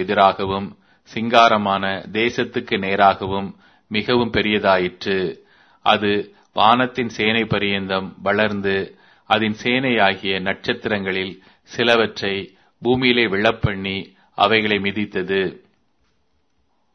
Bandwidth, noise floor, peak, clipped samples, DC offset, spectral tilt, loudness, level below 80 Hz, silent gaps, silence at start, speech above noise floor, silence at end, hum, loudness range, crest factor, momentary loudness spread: 6.6 kHz; -68 dBFS; 0 dBFS; under 0.1%; under 0.1%; -5.5 dB/octave; -19 LUFS; -50 dBFS; none; 0 s; 49 dB; 1.35 s; none; 2 LU; 20 dB; 11 LU